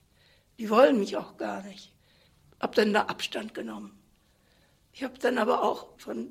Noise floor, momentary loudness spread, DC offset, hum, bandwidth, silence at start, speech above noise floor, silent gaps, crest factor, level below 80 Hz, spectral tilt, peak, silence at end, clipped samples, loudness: -64 dBFS; 18 LU; under 0.1%; none; 15.5 kHz; 0.6 s; 37 dB; none; 22 dB; -70 dBFS; -5 dB/octave; -8 dBFS; 0 s; under 0.1%; -28 LUFS